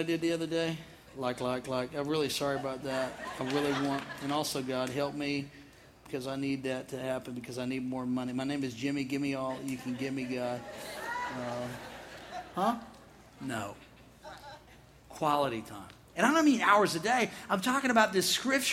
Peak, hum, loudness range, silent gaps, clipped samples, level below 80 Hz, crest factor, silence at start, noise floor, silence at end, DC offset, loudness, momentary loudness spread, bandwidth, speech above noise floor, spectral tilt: -10 dBFS; none; 9 LU; none; under 0.1%; -64 dBFS; 22 dB; 0 s; -56 dBFS; 0 s; under 0.1%; -32 LUFS; 18 LU; 16 kHz; 25 dB; -4 dB/octave